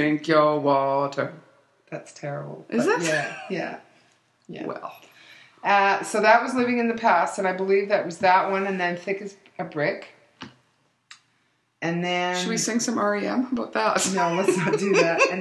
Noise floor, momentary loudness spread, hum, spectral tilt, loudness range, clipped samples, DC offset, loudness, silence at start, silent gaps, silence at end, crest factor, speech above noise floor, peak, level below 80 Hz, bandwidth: -68 dBFS; 17 LU; none; -4 dB/octave; 8 LU; under 0.1%; under 0.1%; -23 LUFS; 0 s; none; 0 s; 20 dB; 45 dB; -4 dBFS; -74 dBFS; 12.5 kHz